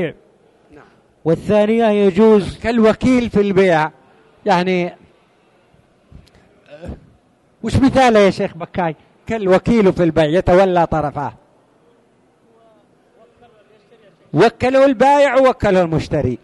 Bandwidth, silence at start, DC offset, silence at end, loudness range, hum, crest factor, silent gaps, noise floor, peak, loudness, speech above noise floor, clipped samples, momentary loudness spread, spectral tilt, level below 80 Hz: 11.5 kHz; 0 s; under 0.1%; 0.05 s; 9 LU; none; 14 dB; none; -55 dBFS; -2 dBFS; -15 LUFS; 41 dB; under 0.1%; 14 LU; -7 dB/octave; -40 dBFS